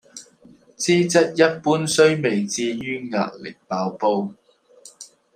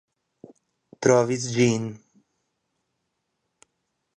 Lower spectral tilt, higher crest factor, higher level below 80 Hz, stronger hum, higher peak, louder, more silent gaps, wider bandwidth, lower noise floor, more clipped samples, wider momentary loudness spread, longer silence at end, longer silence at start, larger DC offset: about the same, -4.5 dB/octave vs -5 dB/octave; about the same, 20 dB vs 22 dB; about the same, -66 dBFS vs -66 dBFS; neither; first, -2 dBFS vs -6 dBFS; about the same, -20 LUFS vs -22 LUFS; neither; first, 15 kHz vs 10.5 kHz; second, -51 dBFS vs -78 dBFS; neither; first, 21 LU vs 9 LU; second, 0.3 s vs 2.2 s; second, 0.15 s vs 1 s; neither